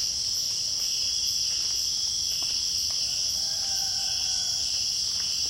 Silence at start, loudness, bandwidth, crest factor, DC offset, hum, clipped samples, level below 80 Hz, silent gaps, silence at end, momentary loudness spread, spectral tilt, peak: 0 s; -24 LUFS; 16.5 kHz; 14 dB; under 0.1%; none; under 0.1%; -54 dBFS; none; 0 s; 1 LU; 1.5 dB/octave; -14 dBFS